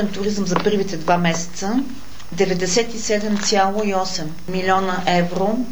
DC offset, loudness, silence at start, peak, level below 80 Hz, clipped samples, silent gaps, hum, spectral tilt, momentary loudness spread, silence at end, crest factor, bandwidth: 5%; -20 LUFS; 0 s; -2 dBFS; -46 dBFS; under 0.1%; none; none; -4.5 dB/octave; 7 LU; 0 s; 18 dB; over 20 kHz